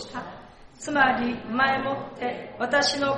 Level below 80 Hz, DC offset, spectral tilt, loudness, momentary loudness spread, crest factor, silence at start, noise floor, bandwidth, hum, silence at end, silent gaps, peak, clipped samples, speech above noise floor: -56 dBFS; under 0.1%; -3 dB/octave; -24 LUFS; 15 LU; 18 dB; 0 s; -46 dBFS; 11.5 kHz; none; 0 s; none; -8 dBFS; under 0.1%; 21 dB